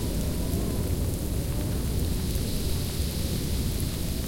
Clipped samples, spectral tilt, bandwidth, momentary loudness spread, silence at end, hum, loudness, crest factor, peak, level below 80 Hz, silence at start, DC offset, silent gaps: under 0.1%; -5.5 dB/octave; 17 kHz; 1 LU; 0 s; none; -29 LUFS; 12 dB; -16 dBFS; -32 dBFS; 0 s; under 0.1%; none